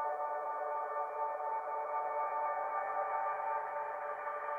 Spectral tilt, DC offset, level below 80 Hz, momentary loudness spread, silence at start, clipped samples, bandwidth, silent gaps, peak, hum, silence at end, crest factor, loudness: -4.5 dB/octave; under 0.1%; -86 dBFS; 4 LU; 0 s; under 0.1%; 3.5 kHz; none; -24 dBFS; 50 Hz at -80 dBFS; 0 s; 14 dB; -38 LUFS